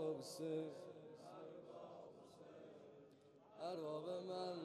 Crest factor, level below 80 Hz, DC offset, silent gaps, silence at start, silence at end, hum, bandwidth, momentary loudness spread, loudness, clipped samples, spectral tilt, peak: 18 dB; under -90 dBFS; under 0.1%; none; 0 s; 0 s; none; 13 kHz; 16 LU; -51 LUFS; under 0.1%; -5.5 dB/octave; -32 dBFS